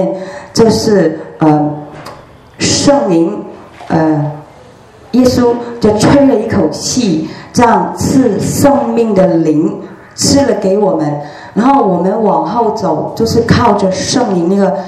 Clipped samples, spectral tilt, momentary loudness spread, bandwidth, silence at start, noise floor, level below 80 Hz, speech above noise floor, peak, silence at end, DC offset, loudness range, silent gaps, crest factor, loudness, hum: 0.4%; -5.5 dB/octave; 9 LU; 14 kHz; 0 s; -37 dBFS; -40 dBFS; 27 dB; 0 dBFS; 0 s; under 0.1%; 2 LU; none; 10 dB; -11 LUFS; none